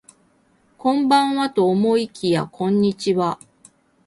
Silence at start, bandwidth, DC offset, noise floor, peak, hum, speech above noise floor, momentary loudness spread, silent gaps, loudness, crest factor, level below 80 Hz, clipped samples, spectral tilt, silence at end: 0.85 s; 11.5 kHz; under 0.1%; -60 dBFS; -4 dBFS; none; 41 dB; 6 LU; none; -20 LUFS; 16 dB; -62 dBFS; under 0.1%; -6 dB/octave; 0.7 s